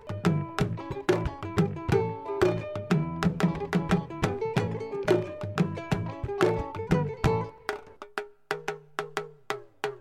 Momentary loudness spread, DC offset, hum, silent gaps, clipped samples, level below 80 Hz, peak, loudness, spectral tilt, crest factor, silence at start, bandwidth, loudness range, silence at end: 10 LU; under 0.1%; none; none; under 0.1%; -46 dBFS; -10 dBFS; -30 LUFS; -7 dB/octave; 20 dB; 0 s; 15 kHz; 3 LU; 0 s